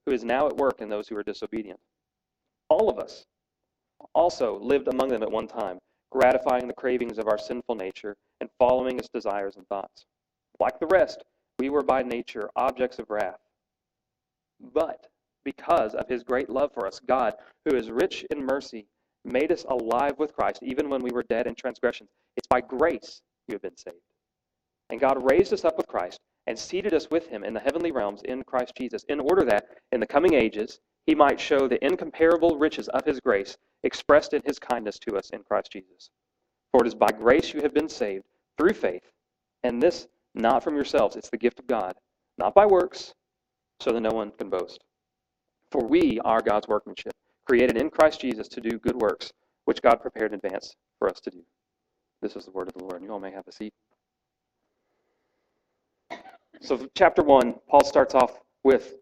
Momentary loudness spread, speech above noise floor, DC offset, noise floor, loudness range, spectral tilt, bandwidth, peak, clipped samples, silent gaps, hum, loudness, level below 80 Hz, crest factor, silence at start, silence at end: 18 LU; 62 dB; under 0.1%; -87 dBFS; 7 LU; -5 dB/octave; 16 kHz; -2 dBFS; under 0.1%; none; none; -25 LUFS; -56 dBFS; 24 dB; 0.05 s; 0.05 s